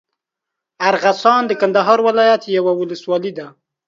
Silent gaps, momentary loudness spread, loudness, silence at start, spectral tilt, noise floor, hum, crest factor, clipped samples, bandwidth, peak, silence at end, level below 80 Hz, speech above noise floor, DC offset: none; 8 LU; -15 LUFS; 0.8 s; -5 dB/octave; -82 dBFS; none; 16 dB; under 0.1%; 7.6 kHz; 0 dBFS; 0.4 s; -70 dBFS; 67 dB; under 0.1%